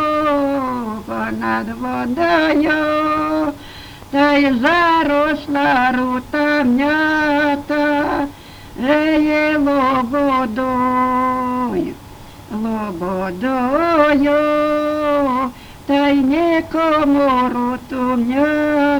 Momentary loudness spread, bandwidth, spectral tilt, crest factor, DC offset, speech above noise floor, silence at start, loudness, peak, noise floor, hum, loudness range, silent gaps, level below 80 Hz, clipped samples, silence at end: 9 LU; over 20 kHz; -6 dB/octave; 16 dB; under 0.1%; 21 dB; 0 s; -16 LUFS; 0 dBFS; -37 dBFS; none; 3 LU; none; -44 dBFS; under 0.1%; 0 s